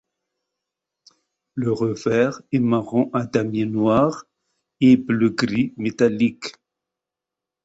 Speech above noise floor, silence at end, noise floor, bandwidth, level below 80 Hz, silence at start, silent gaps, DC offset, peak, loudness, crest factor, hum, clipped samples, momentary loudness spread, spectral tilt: 67 dB; 1.15 s; -87 dBFS; 8 kHz; -58 dBFS; 1.55 s; none; under 0.1%; -4 dBFS; -20 LUFS; 18 dB; none; under 0.1%; 8 LU; -7 dB/octave